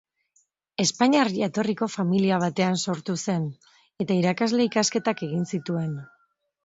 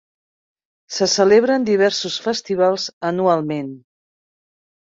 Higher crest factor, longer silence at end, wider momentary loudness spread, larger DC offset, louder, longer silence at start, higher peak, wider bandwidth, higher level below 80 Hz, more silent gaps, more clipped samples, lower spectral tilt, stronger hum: about the same, 20 dB vs 18 dB; second, 0.6 s vs 1.1 s; second, 8 LU vs 12 LU; neither; second, -25 LUFS vs -18 LUFS; about the same, 0.8 s vs 0.9 s; second, -6 dBFS vs -2 dBFS; about the same, 8 kHz vs 7.8 kHz; about the same, -68 dBFS vs -64 dBFS; second, none vs 2.93-3.01 s; neither; about the same, -5 dB/octave vs -4 dB/octave; neither